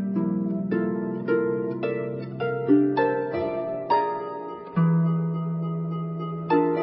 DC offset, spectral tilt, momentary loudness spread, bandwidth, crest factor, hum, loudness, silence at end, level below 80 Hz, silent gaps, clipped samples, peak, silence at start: under 0.1%; -12.5 dB/octave; 9 LU; 5.6 kHz; 16 dB; none; -26 LUFS; 0 s; -62 dBFS; none; under 0.1%; -8 dBFS; 0 s